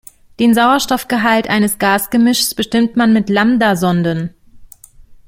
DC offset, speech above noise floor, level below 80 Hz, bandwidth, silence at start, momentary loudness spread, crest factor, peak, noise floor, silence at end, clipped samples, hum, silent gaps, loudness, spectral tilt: under 0.1%; 28 dB; -46 dBFS; 16.5 kHz; 0.4 s; 5 LU; 14 dB; 0 dBFS; -41 dBFS; 0.15 s; under 0.1%; none; none; -13 LUFS; -4.5 dB/octave